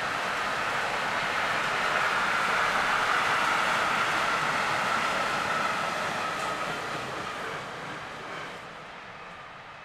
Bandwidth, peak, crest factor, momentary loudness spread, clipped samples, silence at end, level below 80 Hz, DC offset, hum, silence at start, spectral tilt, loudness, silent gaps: 16 kHz; -12 dBFS; 16 dB; 16 LU; under 0.1%; 0 s; -58 dBFS; under 0.1%; none; 0 s; -2.5 dB/octave; -27 LUFS; none